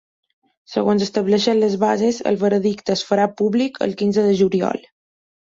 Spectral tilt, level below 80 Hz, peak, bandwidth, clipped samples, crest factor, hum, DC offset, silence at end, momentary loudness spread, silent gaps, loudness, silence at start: -6 dB/octave; -60 dBFS; -4 dBFS; 7.8 kHz; under 0.1%; 16 dB; none; under 0.1%; 0.8 s; 5 LU; none; -19 LUFS; 0.7 s